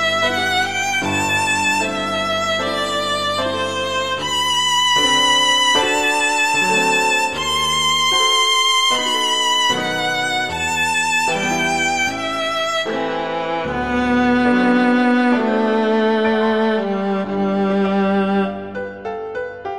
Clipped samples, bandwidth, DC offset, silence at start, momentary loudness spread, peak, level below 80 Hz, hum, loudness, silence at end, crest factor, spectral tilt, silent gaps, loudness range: under 0.1%; 15.5 kHz; 0.6%; 0 s; 8 LU; -4 dBFS; -48 dBFS; none; -16 LUFS; 0 s; 14 dB; -2.5 dB/octave; none; 4 LU